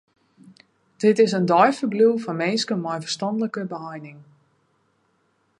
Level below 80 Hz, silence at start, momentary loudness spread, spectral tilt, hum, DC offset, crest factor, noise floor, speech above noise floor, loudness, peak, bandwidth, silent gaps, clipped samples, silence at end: -76 dBFS; 1 s; 15 LU; -5.5 dB/octave; none; under 0.1%; 20 dB; -67 dBFS; 46 dB; -21 LUFS; -4 dBFS; 11 kHz; none; under 0.1%; 1.35 s